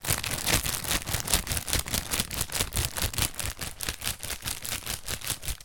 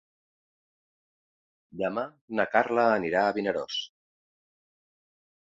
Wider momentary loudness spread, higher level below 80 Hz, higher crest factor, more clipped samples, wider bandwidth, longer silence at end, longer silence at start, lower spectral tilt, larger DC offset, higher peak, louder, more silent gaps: second, 7 LU vs 10 LU; first, -40 dBFS vs -70 dBFS; first, 28 dB vs 22 dB; neither; first, 17.5 kHz vs 7.8 kHz; second, 0 s vs 1.55 s; second, 0 s vs 1.75 s; second, -2 dB/octave vs -5 dB/octave; neither; first, -2 dBFS vs -8 dBFS; about the same, -29 LUFS vs -27 LUFS; second, none vs 2.21-2.28 s